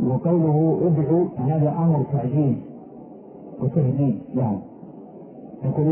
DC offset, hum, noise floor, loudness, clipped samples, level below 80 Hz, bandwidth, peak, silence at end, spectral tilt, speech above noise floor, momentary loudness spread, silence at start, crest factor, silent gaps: under 0.1%; none; -41 dBFS; -22 LUFS; under 0.1%; -56 dBFS; 2.9 kHz; -8 dBFS; 0 s; -15 dB/octave; 21 dB; 22 LU; 0 s; 12 dB; none